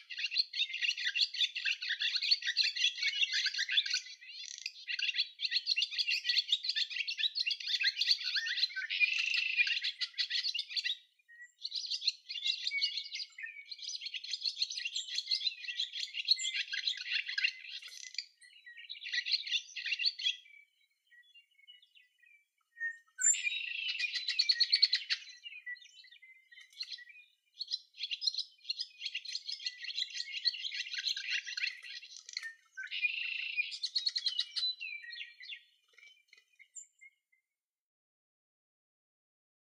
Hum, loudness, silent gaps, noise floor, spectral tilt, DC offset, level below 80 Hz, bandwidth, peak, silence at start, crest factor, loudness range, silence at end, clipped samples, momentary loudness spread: none; -33 LUFS; none; -88 dBFS; 11.5 dB/octave; under 0.1%; under -90 dBFS; 14.5 kHz; -14 dBFS; 0 s; 24 dB; 8 LU; 2.7 s; under 0.1%; 15 LU